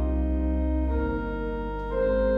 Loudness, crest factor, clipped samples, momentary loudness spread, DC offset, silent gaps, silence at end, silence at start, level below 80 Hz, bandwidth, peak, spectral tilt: -28 LUFS; 10 dB; under 0.1%; 6 LU; under 0.1%; none; 0 s; 0 s; -28 dBFS; 4.4 kHz; -14 dBFS; -10.5 dB/octave